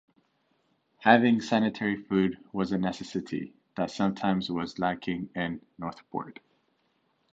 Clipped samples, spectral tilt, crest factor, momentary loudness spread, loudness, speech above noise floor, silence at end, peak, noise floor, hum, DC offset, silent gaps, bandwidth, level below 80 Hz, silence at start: under 0.1%; -6.5 dB/octave; 24 dB; 16 LU; -28 LUFS; 44 dB; 1 s; -6 dBFS; -72 dBFS; none; under 0.1%; none; 8 kHz; -62 dBFS; 1 s